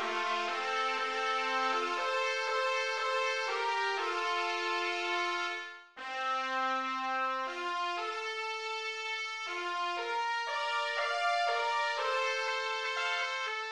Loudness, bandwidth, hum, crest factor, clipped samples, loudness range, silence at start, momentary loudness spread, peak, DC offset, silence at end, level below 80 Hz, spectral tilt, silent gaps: -32 LUFS; 12 kHz; none; 14 dB; under 0.1%; 3 LU; 0 s; 5 LU; -18 dBFS; under 0.1%; 0 s; -86 dBFS; 0.5 dB/octave; none